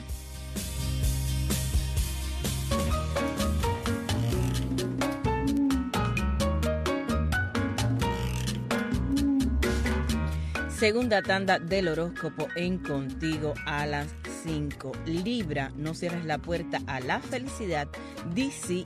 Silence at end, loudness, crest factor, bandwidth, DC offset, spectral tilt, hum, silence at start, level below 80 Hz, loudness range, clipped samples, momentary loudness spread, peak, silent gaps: 0 s; -29 LUFS; 18 dB; 14.5 kHz; under 0.1%; -5.5 dB/octave; none; 0 s; -36 dBFS; 5 LU; under 0.1%; 7 LU; -12 dBFS; none